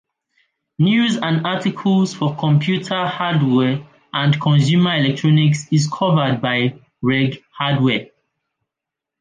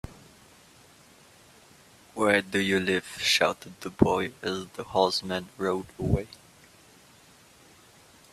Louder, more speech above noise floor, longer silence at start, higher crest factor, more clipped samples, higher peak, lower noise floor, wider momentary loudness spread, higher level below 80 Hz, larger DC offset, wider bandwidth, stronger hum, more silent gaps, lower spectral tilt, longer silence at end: first, -18 LUFS vs -27 LUFS; first, 68 dB vs 29 dB; first, 0.8 s vs 0.05 s; second, 14 dB vs 26 dB; neither; about the same, -4 dBFS vs -4 dBFS; first, -85 dBFS vs -56 dBFS; second, 6 LU vs 13 LU; second, -60 dBFS vs -50 dBFS; neither; second, 9.4 kHz vs 14.5 kHz; neither; neither; first, -6.5 dB/octave vs -4.5 dB/octave; second, 1.15 s vs 1.95 s